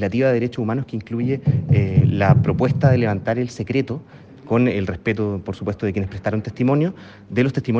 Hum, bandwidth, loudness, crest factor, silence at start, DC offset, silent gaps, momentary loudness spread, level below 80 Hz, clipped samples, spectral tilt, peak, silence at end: none; 7.4 kHz; -20 LUFS; 18 dB; 0 s; under 0.1%; none; 9 LU; -48 dBFS; under 0.1%; -9 dB/octave; -2 dBFS; 0 s